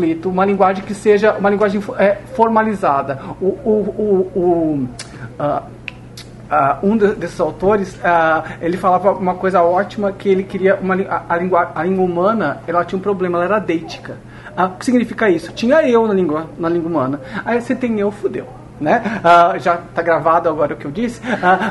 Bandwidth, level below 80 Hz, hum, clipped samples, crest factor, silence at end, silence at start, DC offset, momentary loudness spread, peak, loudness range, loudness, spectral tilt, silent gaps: 11.5 kHz; -46 dBFS; none; under 0.1%; 16 dB; 0 s; 0 s; under 0.1%; 10 LU; 0 dBFS; 3 LU; -16 LUFS; -7 dB/octave; none